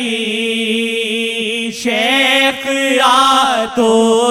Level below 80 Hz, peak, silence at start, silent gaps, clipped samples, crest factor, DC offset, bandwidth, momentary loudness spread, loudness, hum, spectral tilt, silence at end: -56 dBFS; 0 dBFS; 0 s; none; under 0.1%; 12 dB; under 0.1%; 16.5 kHz; 7 LU; -13 LUFS; none; -2 dB/octave; 0 s